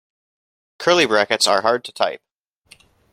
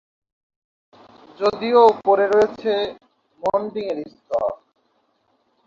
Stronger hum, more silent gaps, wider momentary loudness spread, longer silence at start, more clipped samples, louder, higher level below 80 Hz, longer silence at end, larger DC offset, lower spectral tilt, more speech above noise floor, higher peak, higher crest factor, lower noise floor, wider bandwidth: neither; neither; second, 8 LU vs 14 LU; second, 0.8 s vs 1.4 s; neither; about the same, -18 LUFS vs -20 LUFS; about the same, -64 dBFS vs -62 dBFS; second, 0.95 s vs 1.1 s; neither; second, -2 dB/octave vs -5.5 dB/octave; second, 36 dB vs 47 dB; about the same, 0 dBFS vs -2 dBFS; about the same, 20 dB vs 20 dB; second, -53 dBFS vs -66 dBFS; first, 16 kHz vs 7.4 kHz